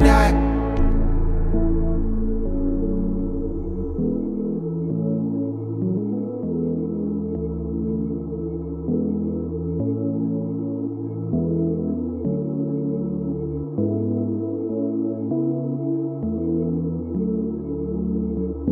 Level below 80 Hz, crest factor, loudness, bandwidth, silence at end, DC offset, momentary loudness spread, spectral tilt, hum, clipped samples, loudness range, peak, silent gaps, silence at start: -28 dBFS; 20 dB; -24 LUFS; 11.5 kHz; 0 s; under 0.1%; 4 LU; -8.5 dB/octave; none; under 0.1%; 1 LU; -2 dBFS; none; 0 s